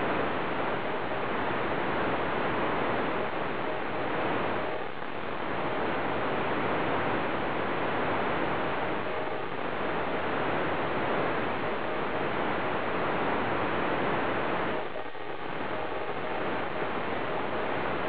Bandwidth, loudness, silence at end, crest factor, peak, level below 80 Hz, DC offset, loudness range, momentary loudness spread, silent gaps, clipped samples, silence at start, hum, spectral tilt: 5.4 kHz; -31 LUFS; 0 s; 12 dB; -16 dBFS; -56 dBFS; 2%; 2 LU; 5 LU; none; under 0.1%; 0 s; none; -9 dB/octave